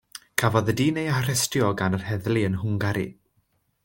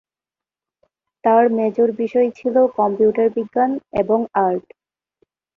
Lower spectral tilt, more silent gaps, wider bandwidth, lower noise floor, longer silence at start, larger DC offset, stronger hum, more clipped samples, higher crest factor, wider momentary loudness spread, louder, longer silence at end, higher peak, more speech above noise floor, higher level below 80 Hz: second, -5 dB/octave vs -9 dB/octave; neither; first, 17 kHz vs 6 kHz; second, -69 dBFS vs -90 dBFS; second, 0.4 s vs 1.25 s; neither; neither; neither; first, 24 dB vs 16 dB; about the same, 5 LU vs 5 LU; second, -24 LUFS vs -18 LUFS; second, 0.7 s vs 0.95 s; about the same, -2 dBFS vs -2 dBFS; second, 46 dB vs 73 dB; about the same, -56 dBFS vs -58 dBFS